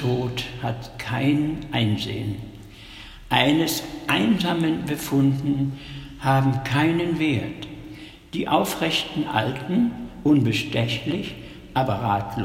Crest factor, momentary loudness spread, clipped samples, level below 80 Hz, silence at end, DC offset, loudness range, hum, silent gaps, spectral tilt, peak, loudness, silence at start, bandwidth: 20 dB; 16 LU; under 0.1%; -48 dBFS; 0 s; under 0.1%; 2 LU; none; none; -5.5 dB/octave; -2 dBFS; -23 LUFS; 0 s; 16.5 kHz